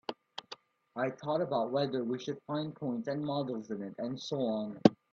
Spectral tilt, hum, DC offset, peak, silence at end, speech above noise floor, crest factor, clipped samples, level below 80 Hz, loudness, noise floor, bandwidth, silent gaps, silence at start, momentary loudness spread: -7 dB/octave; none; under 0.1%; -6 dBFS; 0.2 s; 21 dB; 30 dB; under 0.1%; -76 dBFS; -34 LUFS; -54 dBFS; 7.6 kHz; none; 0.1 s; 16 LU